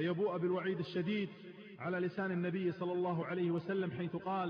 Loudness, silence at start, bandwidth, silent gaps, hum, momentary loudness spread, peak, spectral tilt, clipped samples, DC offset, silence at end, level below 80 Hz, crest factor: -37 LUFS; 0 s; 5.4 kHz; none; none; 5 LU; -26 dBFS; -6 dB/octave; under 0.1%; under 0.1%; 0 s; -80 dBFS; 12 dB